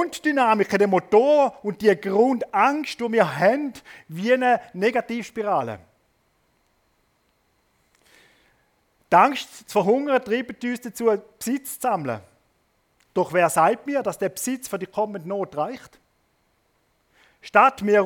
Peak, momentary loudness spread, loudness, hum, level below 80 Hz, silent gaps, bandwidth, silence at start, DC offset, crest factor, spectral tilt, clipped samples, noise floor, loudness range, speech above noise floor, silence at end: -2 dBFS; 12 LU; -22 LUFS; none; -68 dBFS; none; 18.5 kHz; 0 s; under 0.1%; 22 dB; -5 dB/octave; under 0.1%; -67 dBFS; 9 LU; 46 dB; 0 s